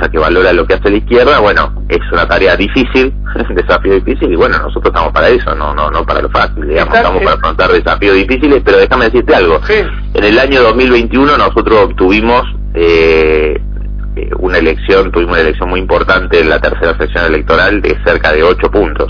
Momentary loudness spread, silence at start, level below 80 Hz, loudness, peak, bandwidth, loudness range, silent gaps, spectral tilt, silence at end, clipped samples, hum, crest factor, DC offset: 6 LU; 0 s; -18 dBFS; -9 LUFS; 0 dBFS; 5.4 kHz; 3 LU; none; -7 dB/octave; 0 s; 0.5%; 50 Hz at -20 dBFS; 8 dB; under 0.1%